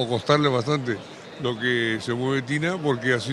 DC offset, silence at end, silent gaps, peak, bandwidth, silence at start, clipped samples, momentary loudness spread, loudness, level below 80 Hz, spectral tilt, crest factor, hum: under 0.1%; 0 s; none; -4 dBFS; 12 kHz; 0 s; under 0.1%; 10 LU; -24 LUFS; -60 dBFS; -5.5 dB/octave; 20 dB; none